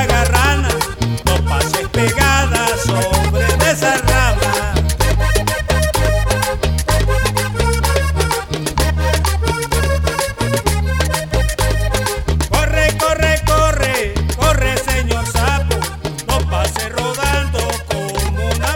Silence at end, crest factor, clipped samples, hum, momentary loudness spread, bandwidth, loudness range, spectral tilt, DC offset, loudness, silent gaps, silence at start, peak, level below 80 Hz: 0 s; 14 dB; under 0.1%; none; 5 LU; 18 kHz; 3 LU; -4 dB/octave; under 0.1%; -16 LUFS; none; 0 s; 0 dBFS; -20 dBFS